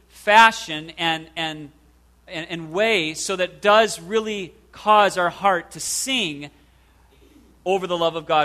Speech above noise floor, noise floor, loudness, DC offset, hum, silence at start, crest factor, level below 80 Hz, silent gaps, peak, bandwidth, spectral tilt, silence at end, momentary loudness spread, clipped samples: 35 dB; -55 dBFS; -20 LUFS; under 0.1%; none; 0.15 s; 22 dB; -56 dBFS; none; 0 dBFS; 14 kHz; -2.5 dB/octave; 0 s; 15 LU; under 0.1%